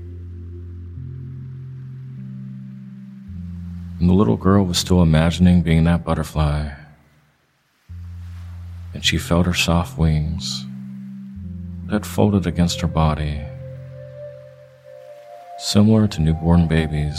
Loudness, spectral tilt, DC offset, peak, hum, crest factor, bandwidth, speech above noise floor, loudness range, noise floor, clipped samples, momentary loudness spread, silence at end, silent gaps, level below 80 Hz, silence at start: -18 LUFS; -6 dB/octave; under 0.1%; 0 dBFS; none; 20 dB; 15 kHz; 46 dB; 9 LU; -63 dBFS; under 0.1%; 21 LU; 0 s; none; -32 dBFS; 0 s